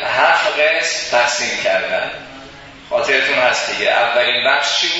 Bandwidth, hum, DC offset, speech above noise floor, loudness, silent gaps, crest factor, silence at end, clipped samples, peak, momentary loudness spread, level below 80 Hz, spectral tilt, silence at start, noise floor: 8 kHz; none; under 0.1%; 21 dB; -15 LUFS; none; 16 dB; 0 s; under 0.1%; 0 dBFS; 9 LU; -54 dBFS; -0.5 dB/octave; 0 s; -37 dBFS